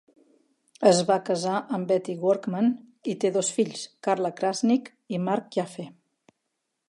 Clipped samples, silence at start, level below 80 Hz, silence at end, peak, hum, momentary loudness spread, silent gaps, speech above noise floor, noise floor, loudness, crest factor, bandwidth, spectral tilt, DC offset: under 0.1%; 0.8 s; -78 dBFS; 1 s; -4 dBFS; none; 11 LU; none; 55 dB; -80 dBFS; -26 LUFS; 22 dB; 11.5 kHz; -5 dB/octave; under 0.1%